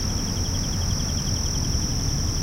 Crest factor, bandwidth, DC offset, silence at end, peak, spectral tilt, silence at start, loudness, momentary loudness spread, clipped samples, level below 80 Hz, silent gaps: 14 dB; 16 kHz; 0.1%; 0 s; -10 dBFS; -3.5 dB/octave; 0 s; -25 LUFS; 1 LU; under 0.1%; -30 dBFS; none